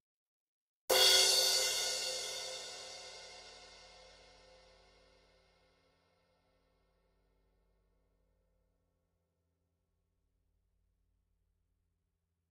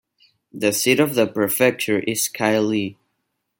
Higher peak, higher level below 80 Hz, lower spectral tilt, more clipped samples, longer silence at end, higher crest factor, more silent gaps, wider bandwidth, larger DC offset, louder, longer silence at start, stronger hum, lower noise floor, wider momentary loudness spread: second, -14 dBFS vs -2 dBFS; second, -74 dBFS vs -64 dBFS; second, 1.5 dB/octave vs -3.5 dB/octave; neither; first, 8.85 s vs 0.65 s; first, 26 dB vs 20 dB; neither; about the same, 16 kHz vs 17 kHz; neither; second, -29 LUFS vs -19 LUFS; first, 0.9 s vs 0.55 s; neither; first, -85 dBFS vs -75 dBFS; first, 26 LU vs 6 LU